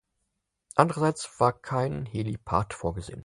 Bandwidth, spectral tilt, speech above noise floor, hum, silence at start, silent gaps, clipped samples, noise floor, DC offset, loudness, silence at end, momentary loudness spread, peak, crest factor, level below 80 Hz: 11.5 kHz; -6 dB/octave; 53 dB; none; 0.75 s; none; under 0.1%; -80 dBFS; under 0.1%; -28 LUFS; 0 s; 9 LU; -2 dBFS; 26 dB; -50 dBFS